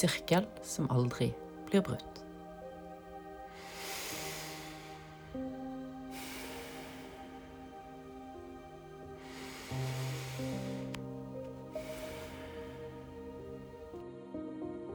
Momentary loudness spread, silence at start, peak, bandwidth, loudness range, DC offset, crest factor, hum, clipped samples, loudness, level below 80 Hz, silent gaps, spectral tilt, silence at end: 17 LU; 0 s; -14 dBFS; over 20 kHz; 9 LU; under 0.1%; 26 dB; none; under 0.1%; -40 LUFS; -60 dBFS; none; -5 dB/octave; 0 s